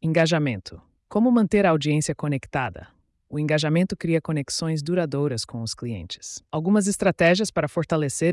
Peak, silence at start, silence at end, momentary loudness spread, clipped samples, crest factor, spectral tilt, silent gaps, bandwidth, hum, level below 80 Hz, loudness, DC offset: -10 dBFS; 0.05 s; 0 s; 12 LU; under 0.1%; 14 dB; -5.5 dB/octave; none; 12 kHz; none; -54 dBFS; -23 LUFS; under 0.1%